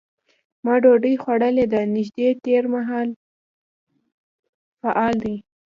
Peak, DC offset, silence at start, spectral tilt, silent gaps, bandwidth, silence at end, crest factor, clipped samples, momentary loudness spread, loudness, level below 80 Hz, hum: -4 dBFS; under 0.1%; 0.65 s; -8 dB/octave; 3.16-3.87 s, 4.12-4.43 s, 4.49-4.77 s; 7 kHz; 0.35 s; 18 dB; under 0.1%; 13 LU; -20 LUFS; -60 dBFS; none